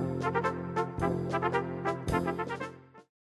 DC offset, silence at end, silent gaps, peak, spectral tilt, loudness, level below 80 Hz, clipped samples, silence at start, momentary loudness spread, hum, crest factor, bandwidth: under 0.1%; 0.25 s; none; -12 dBFS; -7 dB/octave; -32 LUFS; -50 dBFS; under 0.1%; 0 s; 6 LU; none; 20 dB; 12.5 kHz